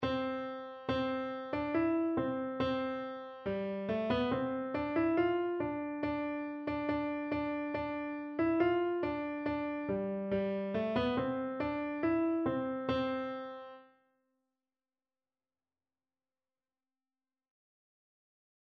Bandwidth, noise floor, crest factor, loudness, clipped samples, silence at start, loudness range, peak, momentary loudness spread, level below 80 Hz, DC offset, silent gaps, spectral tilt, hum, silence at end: 6 kHz; under -90 dBFS; 18 dB; -35 LUFS; under 0.1%; 0 s; 3 LU; -18 dBFS; 7 LU; -62 dBFS; under 0.1%; none; -8.5 dB/octave; none; 4.75 s